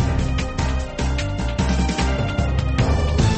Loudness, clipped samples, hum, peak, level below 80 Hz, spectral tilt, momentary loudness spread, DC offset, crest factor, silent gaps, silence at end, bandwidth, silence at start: -22 LUFS; under 0.1%; none; -8 dBFS; -24 dBFS; -6 dB/octave; 5 LU; under 0.1%; 12 dB; none; 0 s; 8.8 kHz; 0 s